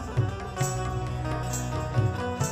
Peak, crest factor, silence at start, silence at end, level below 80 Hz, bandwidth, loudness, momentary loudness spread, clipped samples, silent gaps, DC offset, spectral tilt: -12 dBFS; 16 dB; 0 s; 0 s; -40 dBFS; 15.5 kHz; -29 LUFS; 4 LU; under 0.1%; none; under 0.1%; -5.5 dB/octave